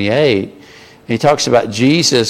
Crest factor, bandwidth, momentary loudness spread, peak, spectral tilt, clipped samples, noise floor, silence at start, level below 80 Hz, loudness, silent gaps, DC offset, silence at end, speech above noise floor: 14 dB; 16 kHz; 9 LU; 0 dBFS; -4.5 dB/octave; under 0.1%; -40 dBFS; 0 s; -50 dBFS; -13 LUFS; none; under 0.1%; 0 s; 27 dB